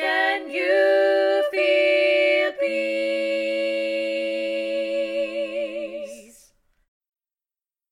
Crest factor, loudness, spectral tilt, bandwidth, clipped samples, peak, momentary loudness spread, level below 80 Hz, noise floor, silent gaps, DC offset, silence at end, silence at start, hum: 14 dB; -22 LUFS; -2.5 dB/octave; 11.5 kHz; under 0.1%; -8 dBFS; 10 LU; -68 dBFS; under -90 dBFS; none; under 0.1%; 1.7 s; 0 s; none